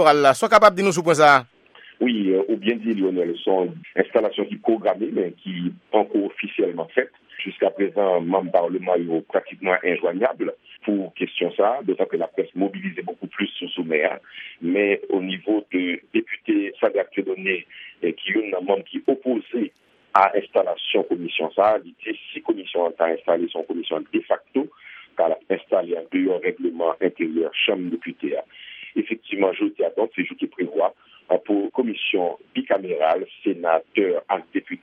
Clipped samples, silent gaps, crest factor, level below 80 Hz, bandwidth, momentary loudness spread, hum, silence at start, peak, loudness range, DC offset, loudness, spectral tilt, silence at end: under 0.1%; none; 22 dB; -68 dBFS; 13 kHz; 9 LU; none; 0 s; 0 dBFS; 3 LU; under 0.1%; -22 LUFS; -5 dB/octave; 0.05 s